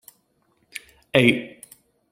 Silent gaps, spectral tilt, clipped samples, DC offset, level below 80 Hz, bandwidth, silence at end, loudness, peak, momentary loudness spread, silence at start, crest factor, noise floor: none; -5.5 dB/octave; under 0.1%; under 0.1%; -60 dBFS; 16 kHz; 0.65 s; -20 LUFS; 0 dBFS; 21 LU; 0.75 s; 24 dB; -67 dBFS